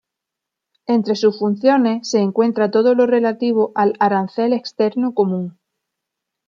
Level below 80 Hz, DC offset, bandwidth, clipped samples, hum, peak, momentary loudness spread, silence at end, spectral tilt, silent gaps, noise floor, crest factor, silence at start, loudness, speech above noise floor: -70 dBFS; under 0.1%; 7.4 kHz; under 0.1%; none; -2 dBFS; 5 LU; 0.95 s; -6 dB/octave; none; -83 dBFS; 16 dB; 0.9 s; -17 LUFS; 66 dB